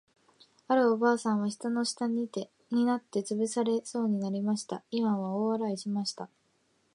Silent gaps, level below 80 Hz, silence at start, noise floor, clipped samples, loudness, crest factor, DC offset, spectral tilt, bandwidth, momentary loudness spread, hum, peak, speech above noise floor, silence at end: none; -82 dBFS; 0.7 s; -71 dBFS; under 0.1%; -30 LUFS; 18 dB; under 0.1%; -5 dB/octave; 11 kHz; 8 LU; none; -14 dBFS; 42 dB; 0.7 s